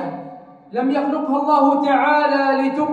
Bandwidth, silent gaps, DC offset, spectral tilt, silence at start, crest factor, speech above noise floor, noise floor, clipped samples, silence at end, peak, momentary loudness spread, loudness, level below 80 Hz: 7.6 kHz; none; under 0.1%; -6.5 dB/octave; 0 s; 16 dB; 22 dB; -39 dBFS; under 0.1%; 0 s; -2 dBFS; 14 LU; -17 LUFS; -70 dBFS